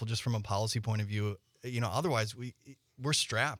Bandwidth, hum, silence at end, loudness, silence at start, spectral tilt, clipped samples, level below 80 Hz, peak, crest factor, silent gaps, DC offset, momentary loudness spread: 15.5 kHz; none; 0 s; -33 LUFS; 0 s; -4 dB/octave; under 0.1%; -66 dBFS; -14 dBFS; 20 dB; none; under 0.1%; 10 LU